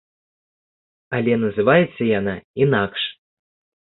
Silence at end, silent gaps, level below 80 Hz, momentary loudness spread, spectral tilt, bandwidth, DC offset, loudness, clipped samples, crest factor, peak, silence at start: 0.85 s; 2.44-2.54 s; -54 dBFS; 10 LU; -11 dB/octave; 4.2 kHz; under 0.1%; -20 LUFS; under 0.1%; 20 dB; -2 dBFS; 1.1 s